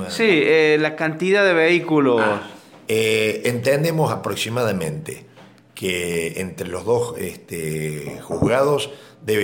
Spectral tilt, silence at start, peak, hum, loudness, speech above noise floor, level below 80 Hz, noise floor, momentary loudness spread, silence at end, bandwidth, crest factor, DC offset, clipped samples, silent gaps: -5 dB/octave; 0 s; -4 dBFS; none; -20 LUFS; 25 dB; -54 dBFS; -45 dBFS; 14 LU; 0 s; 17 kHz; 16 dB; under 0.1%; under 0.1%; none